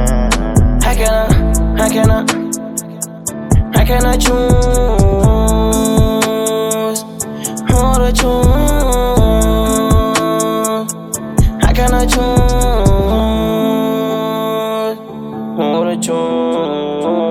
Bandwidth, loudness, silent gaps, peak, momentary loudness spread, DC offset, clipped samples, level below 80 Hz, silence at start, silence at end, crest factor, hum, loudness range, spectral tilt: 16 kHz; -14 LUFS; none; -2 dBFS; 8 LU; under 0.1%; under 0.1%; -16 dBFS; 0 s; 0 s; 12 dB; none; 3 LU; -5.5 dB/octave